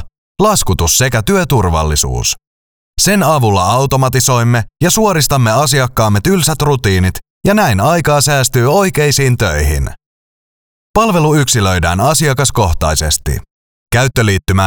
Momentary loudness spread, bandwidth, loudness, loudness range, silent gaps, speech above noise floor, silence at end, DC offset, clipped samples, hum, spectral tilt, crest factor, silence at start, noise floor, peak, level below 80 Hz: 5 LU; over 20 kHz; -12 LUFS; 2 LU; 0.18-0.35 s, 2.47-2.94 s, 7.30-7.41 s, 10.06-10.94 s, 13.51-13.86 s; over 79 dB; 0 s; 0.7%; under 0.1%; none; -4.5 dB/octave; 12 dB; 0 s; under -90 dBFS; 0 dBFS; -26 dBFS